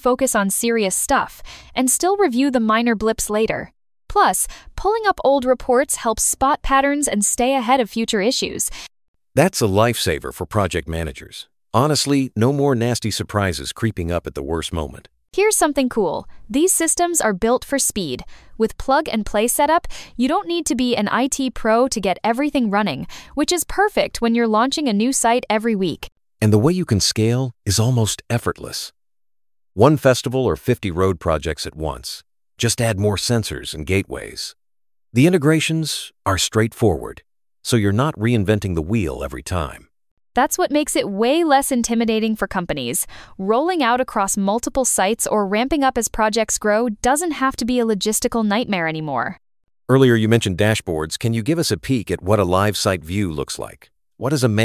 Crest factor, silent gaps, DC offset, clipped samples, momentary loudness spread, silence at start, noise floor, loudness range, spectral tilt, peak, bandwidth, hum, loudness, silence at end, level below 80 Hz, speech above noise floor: 18 dB; 9.08-9.14 s, 40.11-40.17 s; under 0.1%; under 0.1%; 10 LU; 0.05 s; under -90 dBFS; 3 LU; -4.5 dB/octave; 0 dBFS; 16 kHz; none; -19 LUFS; 0 s; -40 dBFS; over 71 dB